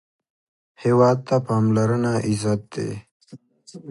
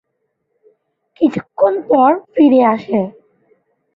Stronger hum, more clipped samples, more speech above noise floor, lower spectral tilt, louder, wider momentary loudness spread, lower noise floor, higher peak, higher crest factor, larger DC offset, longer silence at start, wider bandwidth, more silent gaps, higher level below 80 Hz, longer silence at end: neither; neither; second, 27 dB vs 57 dB; about the same, -7.5 dB/octave vs -8.5 dB/octave; second, -21 LUFS vs -14 LUFS; first, 13 LU vs 9 LU; second, -46 dBFS vs -70 dBFS; about the same, -4 dBFS vs -2 dBFS; about the same, 18 dB vs 14 dB; neither; second, 0.8 s vs 1.2 s; first, 11.5 kHz vs 7.2 kHz; first, 3.11-3.20 s vs none; about the same, -56 dBFS vs -60 dBFS; second, 0 s vs 0.85 s